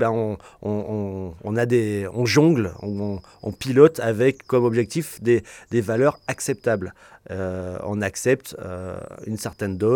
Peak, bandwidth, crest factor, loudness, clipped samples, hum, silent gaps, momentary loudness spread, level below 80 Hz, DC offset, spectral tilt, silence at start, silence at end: -2 dBFS; 18 kHz; 20 dB; -23 LUFS; under 0.1%; none; none; 15 LU; -56 dBFS; under 0.1%; -6 dB/octave; 0 s; 0 s